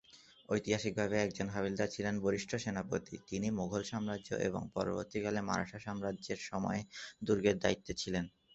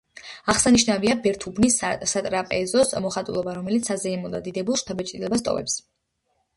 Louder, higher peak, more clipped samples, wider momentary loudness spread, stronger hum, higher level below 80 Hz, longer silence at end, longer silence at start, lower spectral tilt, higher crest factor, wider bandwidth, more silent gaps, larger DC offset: second, -37 LUFS vs -23 LUFS; second, -16 dBFS vs -4 dBFS; neither; second, 7 LU vs 11 LU; neither; second, -62 dBFS vs -50 dBFS; second, 0.25 s vs 0.75 s; about the same, 0.1 s vs 0.15 s; first, -5 dB/octave vs -3.5 dB/octave; about the same, 22 dB vs 20 dB; second, 8.2 kHz vs 11.5 kHz; neither; neither